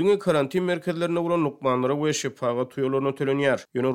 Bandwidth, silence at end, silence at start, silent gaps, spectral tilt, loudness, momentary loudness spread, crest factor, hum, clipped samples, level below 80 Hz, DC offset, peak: 15.5 kHz; 0 s; 0 s; none; -5.5 dB/octave; -25 LUFS; 4 LU; 16 dB; none; under 0.1%; -70 dBFS; under 0.1%; -8 dBFS